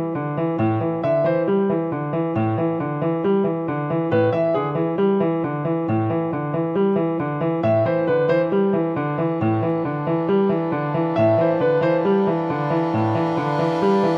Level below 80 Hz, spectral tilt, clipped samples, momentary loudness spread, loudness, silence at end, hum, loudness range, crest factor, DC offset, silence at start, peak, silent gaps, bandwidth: -60 dBFS; -9.5 dB/octave; under 0.1%; 5 LU; -21 LUFS; 0 s; none; 2 LU; 12 dB; under 0.1%; 0 s; -8 dBFS; none; 6.6 kHz